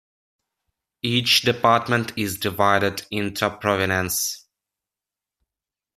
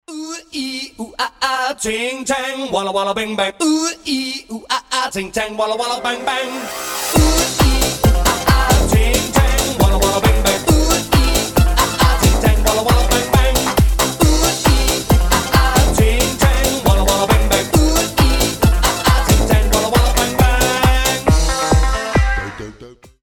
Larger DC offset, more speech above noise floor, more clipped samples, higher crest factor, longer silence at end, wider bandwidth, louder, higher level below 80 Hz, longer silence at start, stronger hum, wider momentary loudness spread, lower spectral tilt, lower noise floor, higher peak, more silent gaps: neither; first, 67 dB vs 21 dB; neither; first, 22 dB vs 14 dB; first, 1.6 s vs 0.35 s; second, 15 kHz vs 18 kHz; second, -21 LUFS vs -15 LUFS; second, -60 dBFS vs -18 dBFS; first, 1.05 s vs 0.1 s; neither; about the same, 10 LU vs 8 LU; about the same, -3.5 dB/octave vs -4 dB/octave; first, -89 dBFS vs -40 dBFS; about the same, -2 dBFS vs 0 dBFS; neither